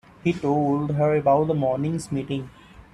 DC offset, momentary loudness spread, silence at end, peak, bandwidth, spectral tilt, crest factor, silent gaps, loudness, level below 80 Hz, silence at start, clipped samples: under 0.1%; 10 LU; 0.45 s; -8 dBFS; 11.5 kHz; -8 dB/octave; 16 dB; none; -23 LUFS; -54 dBFS; 0.25 s; under 0.1%